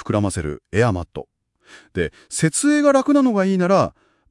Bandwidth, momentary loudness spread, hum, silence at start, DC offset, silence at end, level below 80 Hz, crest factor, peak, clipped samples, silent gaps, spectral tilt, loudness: 12 kHz; 12 LU; none; 0 s; under 0.1%; 0.4 s; -48 dBFS; 16 dB; -4 dBFS; under 0.1%; none; -5.5 dB/octave; -19 LUFS